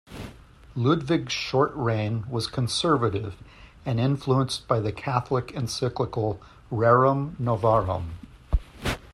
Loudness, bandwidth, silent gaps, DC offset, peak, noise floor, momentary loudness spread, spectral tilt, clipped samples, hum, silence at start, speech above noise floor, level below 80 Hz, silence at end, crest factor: -25 LUFS; 13 kHz; none; under 0.1%; -6 dBFS; -47 dBFS; 15 LU; -6 dB/octave; under 0.1%; none; 0.1 s; 23 dB; -40 dBFS; 0.05 s; 20 dB